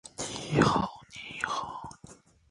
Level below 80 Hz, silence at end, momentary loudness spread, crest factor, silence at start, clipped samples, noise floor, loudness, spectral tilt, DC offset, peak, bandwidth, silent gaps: -54 dBFS; 0.35 s; 19 LU; 24 dB; 0.05 s; under 0.1%; -54 dBFS; -30 LUFS; -5 dB/octave; under 0.1%; -8 dBFS; 11.5 kHz; none